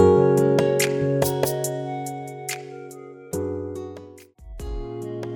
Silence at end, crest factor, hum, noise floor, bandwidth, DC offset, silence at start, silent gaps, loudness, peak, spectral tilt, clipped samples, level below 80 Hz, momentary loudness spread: 0 s; 18 dB; none; -44 dBFS; 19.5 kHz; under 0.1%; 0 s; none; -23 LUFS; -4 dBFS; -5.5 dB/octave; under 0.1%; -42 dBFS; 20 LU